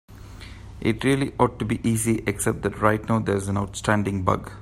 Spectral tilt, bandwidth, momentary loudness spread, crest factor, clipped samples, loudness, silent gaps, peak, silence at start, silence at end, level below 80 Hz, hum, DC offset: -5.5 dB/octave; 16 kHz; 6 LU; 22 dB; under 0.1%; -24 LUFS; none; -2 dBFS; 0.1 s; 0 s; -44 dBFS; none; under 0.1%